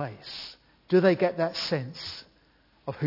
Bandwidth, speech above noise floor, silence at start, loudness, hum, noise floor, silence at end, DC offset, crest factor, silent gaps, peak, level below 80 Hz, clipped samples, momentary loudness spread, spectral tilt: 5.8 kHz; 36 dB; 0 s; -27 LUFS; none; -63 dBFS; 0 s; under 0.1%; 20 dB; none; -10 dBFS; -66 dBFS; under 0.1%; 18 LU; -6.5 dB/octave